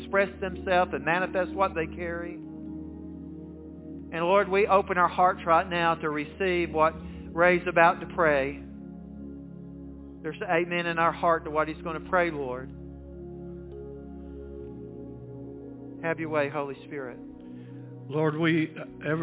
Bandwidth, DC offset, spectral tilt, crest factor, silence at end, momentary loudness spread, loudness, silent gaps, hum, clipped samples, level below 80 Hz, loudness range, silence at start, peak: 4 kHz; under 0.1%; -9.5 dB/octave; 24 dB; 0 s; 20 LU; -26 LUFS; none; none; under 0.1%; -50 dBFS; 10 LU; 0 s; -4 dBFS